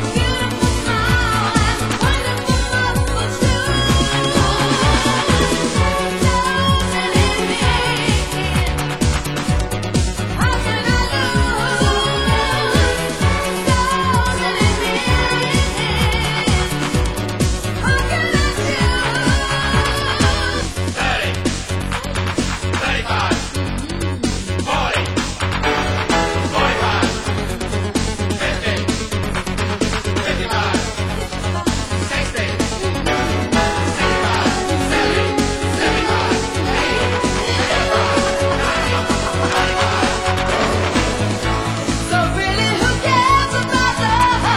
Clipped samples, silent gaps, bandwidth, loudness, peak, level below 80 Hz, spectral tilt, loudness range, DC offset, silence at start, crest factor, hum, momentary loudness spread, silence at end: under 0.1%; none; 16 kHz; -17 LUFS; 0 dBFS; -26 dBFS; -4.5 dB/octave; 4 LU; under 0.1%; 0 s; 16 dB; none; 5 LU; 0 s